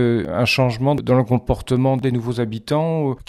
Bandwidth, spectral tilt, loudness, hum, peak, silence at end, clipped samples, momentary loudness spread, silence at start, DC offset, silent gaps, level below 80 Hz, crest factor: 13.5 kHz; -7 dB/octave; -19 LUFS; none; -4 dBFS; 0.05 s; under 0.1%; 5 LU; 0 s; under 0.1%; none; -40 dBFS; 14 dB